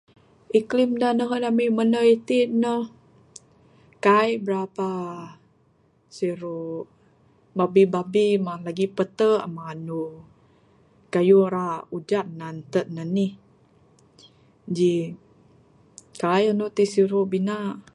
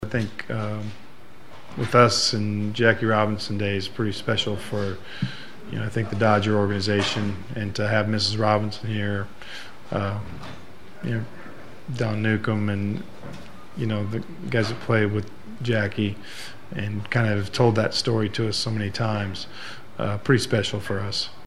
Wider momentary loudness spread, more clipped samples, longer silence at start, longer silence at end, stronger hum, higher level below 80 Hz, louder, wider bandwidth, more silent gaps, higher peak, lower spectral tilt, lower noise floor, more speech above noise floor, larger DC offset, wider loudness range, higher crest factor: about the same, 15 LU vs 17 LU; neither; first, 0.55 s vs 0 s; about the same, 0.15 s vs 0.05 s; neither; second, -70 dBFS vs -56 dBFS; about the same, -23 LUFS vs -24 LUFS; about the same, 11.5 kHz vs 12.5 kHz; neither; second, -6 dBFS vs 0 dBFS; about the same, -6.5 dB/octave vs -5.5 dB/octave; first, -62 dBFS vs -48 dBFS; first, 40 dB vs 23 dB; second, under 0.1% vs 2%; about the same, 7 LU vs 6 LU; second, 18 dB vs 24 dB